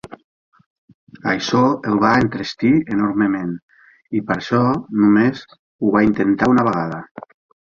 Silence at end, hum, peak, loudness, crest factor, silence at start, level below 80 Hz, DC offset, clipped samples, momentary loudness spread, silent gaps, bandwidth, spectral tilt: 0.45 s; none; -2 dBFS; -18 LUFS; 16 dB; 0.1 s; -50 dBFS; under 0.1%; under 0.1%; 12 LU; 0.24-0.52 s, 0.66-0.88 s, 0.94-1.07 s, 3.62-3.68 s, 5.59-5.79 s, 7.11-7.15 s; 7.4 kHz; -7 dB/octave